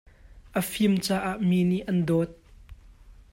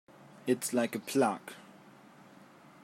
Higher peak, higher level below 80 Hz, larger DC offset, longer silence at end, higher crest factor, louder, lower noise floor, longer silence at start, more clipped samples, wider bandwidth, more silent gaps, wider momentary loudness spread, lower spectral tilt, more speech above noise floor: first, -12 dBFS vs -16 dBFS; first, -52 dBFS vs -84 dBFS; neither; second, 0.2 s vs 1.25 s; second, 14 dB vs 20 dB; first, -26 LUFS vs -32 LUFS; second, -51 dBFS vs -56 dBFS; about the same, 0.35 s vs 0.45 s; neither; about the same, 16 kHz vs 16 kHz; neither; second, 7 LU vs 16 LU; first, -6 dB/octave vs -4.5 dB/octave; about the same, 26 dB vs 25 dB